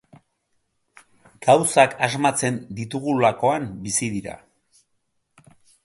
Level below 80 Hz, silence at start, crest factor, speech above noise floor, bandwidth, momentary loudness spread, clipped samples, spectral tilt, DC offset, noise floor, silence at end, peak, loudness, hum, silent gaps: -60 dBFS; 1.4 s; 24 dB; 51 dB; 12 kHz; 13 LU; under 0.1%; -4 dB/octave; under 0.1%; -71 dBFS; 1.5 s; 0 dBFS; -21 LUFS; none; none